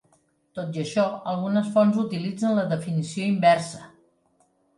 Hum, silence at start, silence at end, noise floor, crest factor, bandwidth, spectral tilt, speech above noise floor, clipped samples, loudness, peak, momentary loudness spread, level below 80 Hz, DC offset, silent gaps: none; 0.55 s; 0.9 s; -66 dBFS; 18 dB; 11.5 kHz; -6.5 dB/octave; 42 dB; under 0.1%; -24 LUFS; -6 dBFS; 13 LU; -70 dBFS; under 0.1%; none